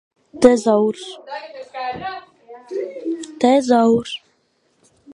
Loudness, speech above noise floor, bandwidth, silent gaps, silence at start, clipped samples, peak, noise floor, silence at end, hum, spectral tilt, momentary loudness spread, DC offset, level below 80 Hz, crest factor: -18 LUFS; 46 dB; 11 kHz; none; 0.35 s; under 0.1%; 0 dBFS; -64 dBFS; 0 s; none; -5 dB/octave; 18 LU; under 0.1%; -56 dBFS; 20 dB